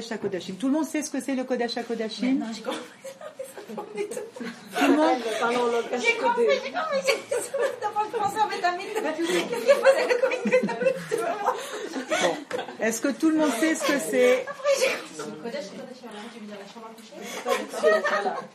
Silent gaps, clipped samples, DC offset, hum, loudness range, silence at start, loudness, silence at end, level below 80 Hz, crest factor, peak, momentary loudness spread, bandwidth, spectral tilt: none; under 0.1%; under 0.1%; none; 6 LU; 0 s; -25 LUFS; 0.05 s; -76 dBFS; 20 dB; -6 dBFS; 17 LU; 14.5 kHz; -3.5 dB/octave